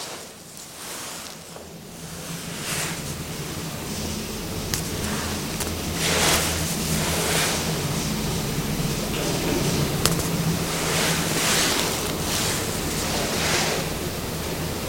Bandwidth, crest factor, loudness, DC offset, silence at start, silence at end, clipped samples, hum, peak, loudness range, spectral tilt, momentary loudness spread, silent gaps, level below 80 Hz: 17 kHz; 26 dB; -24 LUFS; under 0.1%; 0 s; 0 s; under 0.1%; none; 0 dBFS; 8 LU; -3 dB/octave; 14 LU; none; -40 dBFS